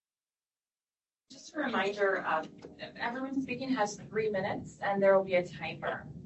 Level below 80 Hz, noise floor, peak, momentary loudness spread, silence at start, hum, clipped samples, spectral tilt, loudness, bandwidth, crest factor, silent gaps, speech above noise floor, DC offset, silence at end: -66 dBFS; under -90 dBFS; -12 dBFS; 13 LU; 1.3 s; none; under 0.1%; -5 dB/octave; -32 LUFS; 8.4 kHz; 22 dB; none; over 58 dB; under 0.1%; 0 s